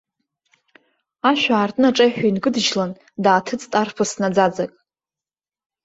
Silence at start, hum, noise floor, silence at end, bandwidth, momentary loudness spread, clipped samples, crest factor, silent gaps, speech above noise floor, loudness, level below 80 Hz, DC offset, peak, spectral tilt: 1.25 s; none; under -90 dBFS; 1.15 s; 8.2 kHz; 7 LU; under 0.1%; 18 dB; none; over 72 dB; -19 LUFS; -64 dBFS; under 0.1%; -2 dBFS; -4 dB/octave